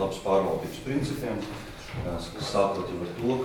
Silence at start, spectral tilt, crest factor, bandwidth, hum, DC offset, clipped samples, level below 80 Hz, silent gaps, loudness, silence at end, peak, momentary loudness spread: 0 s; -6 dB/octave; 18 dB; 19.5 kHz; none; under 0.1%; under 0.1%; -48 dBFS; none; -30 LUFS; 0 s; -10 dBFS; 10 LU